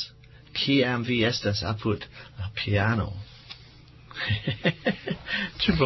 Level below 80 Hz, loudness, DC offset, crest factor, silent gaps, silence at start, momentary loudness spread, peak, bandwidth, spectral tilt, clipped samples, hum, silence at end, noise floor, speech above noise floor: -46 dBFS; -27 LUFS; under 0.1%; 18 dB; none; 0 s; 18 LU; -10 dBFS; 6.2 kHz; -6 dB/octave; under 0.1%; none; 0 s; -50 dBFS; 24 dB